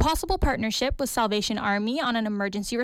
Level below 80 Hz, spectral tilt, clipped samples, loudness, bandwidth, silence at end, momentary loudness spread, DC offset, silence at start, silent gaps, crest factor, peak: -36 dBFS; -4 dB/octave; under 0.1%; -26 LUFS; 16.5 kHz; 0 s; 3 LU; under 0.1%; 0 s; none; 14 dB; -12 dBFS